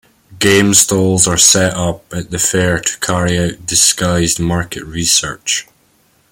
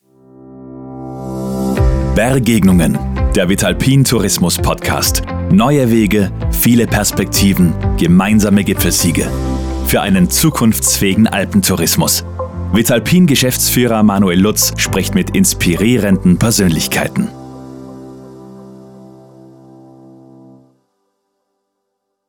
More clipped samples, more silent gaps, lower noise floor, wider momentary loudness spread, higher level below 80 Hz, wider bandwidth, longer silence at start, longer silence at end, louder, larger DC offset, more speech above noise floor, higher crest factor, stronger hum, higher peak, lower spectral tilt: neither; neither; second, -54 dBFS vs -71 dBFS; about the same, 11 LU vs 11 LU; second, -40 dBFS vs -26 dBFS; about the same, over 20 kHz vs over 20 kHz; second, 0.3 s vs 0.45 s; second, 0.7 s vs 3.2 s; about the same, -12 LUFS vs -12 LUFS; neither; second, 41 dB vs 60 dB; about the same, 14 dB vs 12 dB; neither; about the same, 0 dBFS vs -2 dBFS; second, -3 dB/octave vs -4.5 dB/octave